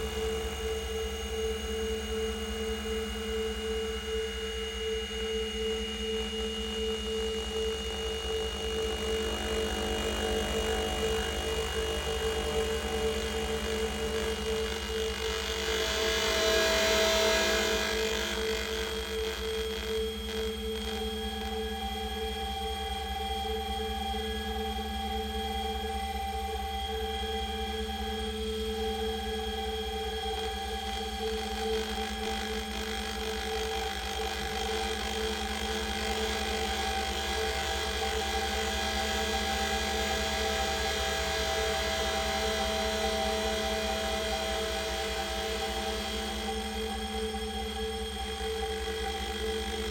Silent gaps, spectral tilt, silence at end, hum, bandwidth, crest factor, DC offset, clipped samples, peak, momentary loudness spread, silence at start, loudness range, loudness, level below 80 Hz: none; -3 dB/octave; 0 s; none; 19 kHz; 18 dB; under 0.1%; under 0.1%; -14 dBFS; 5 LU; 0 s; 6 LU; -31 LUFS; -40 dBFS